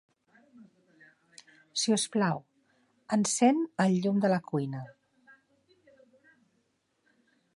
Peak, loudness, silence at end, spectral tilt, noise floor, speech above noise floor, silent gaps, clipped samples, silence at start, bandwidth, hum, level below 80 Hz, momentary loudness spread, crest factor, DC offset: -10 dBFS; -28 LUFS; 2.7 s; -4.5 dB/octave; -75 dBFS; 48 dB; none; under 0.1%; 0.6 s; 11.5 kHz; none; -80 dBFS; 13 LU; 22 dB; under 0.1%